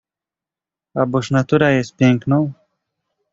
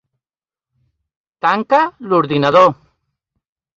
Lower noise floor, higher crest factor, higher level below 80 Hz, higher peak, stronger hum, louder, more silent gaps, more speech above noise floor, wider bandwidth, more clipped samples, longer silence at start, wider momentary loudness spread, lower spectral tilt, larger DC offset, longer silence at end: about the same, -88 dBFS vs under -90 dBFS; about the same, 18 dB vs 16 dB; first, -52 dBFS vs -60 dBFS; about the same, -2 dBFS vs 0 dBFS; neither; second, -17 LUFS vs -14 LUFS; neither; second, 73 dB vs over 77 dB; about the same, 7.8 kHz vs 7.4 kHz; neither; second, 0.95 s vs 1.45 s; about the same, 8 LU vs 7 LU; about the same, -7 dB/octave vs -6.5 dB/octave; neither; second, 0.8 s vs 1.05 s